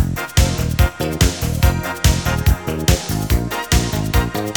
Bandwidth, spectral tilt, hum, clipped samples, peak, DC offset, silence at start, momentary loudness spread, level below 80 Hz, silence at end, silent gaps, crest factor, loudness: over 20 kHz; -4.5 dB/octave; none; under 0.1%; -2 dBFS; 0.3%; 0 s; 2 LU; -22 dBFS; 0 s; none; 16 dB; -18 LUFS